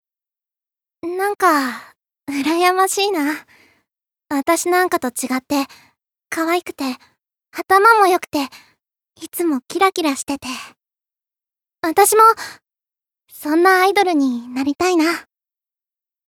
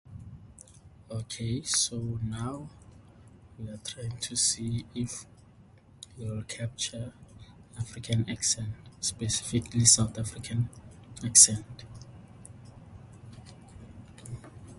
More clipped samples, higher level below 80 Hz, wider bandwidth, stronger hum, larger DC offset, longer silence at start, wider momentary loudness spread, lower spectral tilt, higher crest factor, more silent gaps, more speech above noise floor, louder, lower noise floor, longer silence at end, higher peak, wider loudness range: neither; second, -64 dBFS vs -54 dBFS; first, 19 kHz vs 12 kHz; neither; neither; first, 1.05 s vs 0.1 s; second, 17 LU vs 28 LU; about the same, -2 dB/octave vs -2.5 dB/octave; second, 18 dB vs 30 dB; neither; first, 71 dB vs 27 dB; first, -17 LUFS vs -27 LUFS; first, -88 dBFS vs -56 dBFS; first, 1.05 s vs 0 s; about the same, -2 dBFS vs -2 dBFS; second, 6 LU vs 13 LU